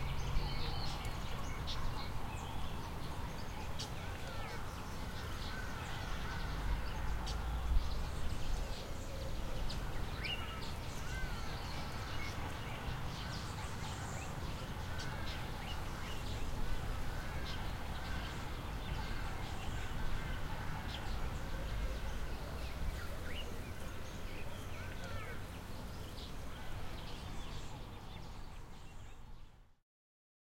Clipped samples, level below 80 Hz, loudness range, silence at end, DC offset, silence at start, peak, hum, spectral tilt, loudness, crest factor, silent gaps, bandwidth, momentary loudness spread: under 0.1%; -44 dBFS; 5 LU; 0.75 s; under 0.1%; 0 s; -20 dBFS; none; -4.5 dB/octave; -44 LUFS; 20 dB; none; 16.5 kHz; 6 LU